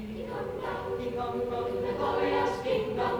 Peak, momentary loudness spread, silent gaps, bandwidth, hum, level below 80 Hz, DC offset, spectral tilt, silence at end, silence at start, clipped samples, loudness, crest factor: -16 dBFS; 7 LU; none; over 20 kHz; none; -52 dBFS; under 0.1%; -6 dB/octave; 0 s; 0 s; under 0.1%; -31 LUFS; 14 dB